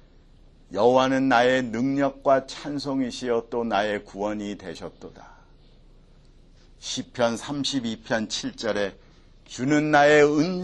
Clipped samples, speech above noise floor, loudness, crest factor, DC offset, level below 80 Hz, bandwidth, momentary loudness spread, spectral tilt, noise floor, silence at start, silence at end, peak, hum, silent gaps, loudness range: under 0.1%; 29 dB; -23 LUFS; 20 dB; under 0.1%; -52 dBFS; 11 kHz; 16 LU; -4.5 dB/octave; -52 dBFS; 0.7 s; 0 s; -4 dBFS; none; none; 10 LU